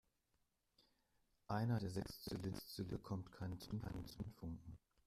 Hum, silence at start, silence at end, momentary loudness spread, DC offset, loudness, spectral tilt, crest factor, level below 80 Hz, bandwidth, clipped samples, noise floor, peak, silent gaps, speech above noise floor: none; 1.5 s; 0.3 s; 11 LU; under 0.1%; -48 LUFS; -6.5 dB/octave; 20 dB; -64 dBFS; 15 kHz; under 0.1%; -85 dBFS; -30 dBFS; none; 38 dB